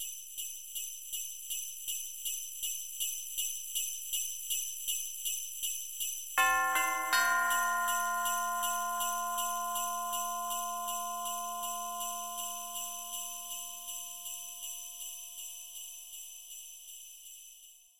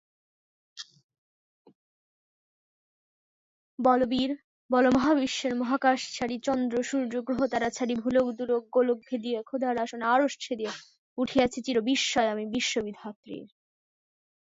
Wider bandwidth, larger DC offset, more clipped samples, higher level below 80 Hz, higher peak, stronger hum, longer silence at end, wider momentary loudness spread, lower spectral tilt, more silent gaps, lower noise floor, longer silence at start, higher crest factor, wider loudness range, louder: first, 16.5 kHz vs 7.8 kHz; first, 0.2% vs under 0.1%; neither; second, -76 dBFS vs -62 dBFS; second, -14 dBFS vs -10 dBFS; neither; second, 0 s vs 0.95 s; second, 14 LU vs 18 LU; second, 2 dB/octave vs -3.5 dB/octave; second, none vs 1.04-1.09 s, 1.18-1.65 s, 1.75-3.78 s, 4.44-4.69 s, 10.98-11.16 s, 13.16-13.23 s; second, -57 dBFS vs under -90 dBFS; second, 0 s vs 0.75 s; about the same, 22 dB vs 20 dB; first, 11 LU vs 3 LU; second, -34 LUFS vs -27 LUFS